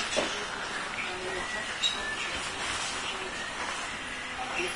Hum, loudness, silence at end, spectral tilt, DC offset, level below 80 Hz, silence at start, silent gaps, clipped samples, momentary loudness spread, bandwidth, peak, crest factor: none; -32 LUFS; 0 s; -1.5 dB/octave; under 0.1%; -56 dBFS; 0 s; none; under 0.1%; 6 LU; 11 kHz; -14 dBFS; 20 dB